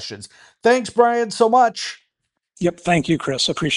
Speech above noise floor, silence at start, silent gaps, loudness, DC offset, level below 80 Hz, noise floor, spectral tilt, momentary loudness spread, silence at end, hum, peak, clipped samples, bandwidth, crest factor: 58 dB; 0 s; none; -18 LUFS; under 0.1%; -54 dBFS; -77 dBFS; -4.5 dB/octave; 13 LU; 0 s; none; 0 dBFS; under 0.1%; 11.5 kHz; 18 dB